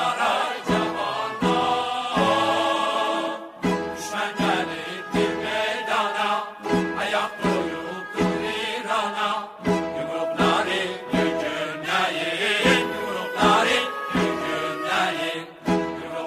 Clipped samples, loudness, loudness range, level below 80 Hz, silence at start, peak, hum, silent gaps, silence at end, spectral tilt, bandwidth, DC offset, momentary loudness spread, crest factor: under 0.1%; -24 LUFS; 3 LU; -52 dBFS; 0 s; -4 dBFS; none; none; 0 s; -4.5 dB/octave; 16 kHz; under 0.1%; 7 LU; 18 dB